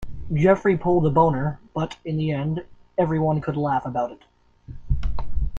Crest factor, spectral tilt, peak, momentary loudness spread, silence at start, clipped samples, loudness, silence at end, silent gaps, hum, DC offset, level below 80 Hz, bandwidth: 18 dB; -9 dB/octave; -4 dBFS; 11 LU; 0 s; under 0.1%; -23 LUFS; 0 s; none; none; under 0.1%; -34 dBFS; 7.2 kHz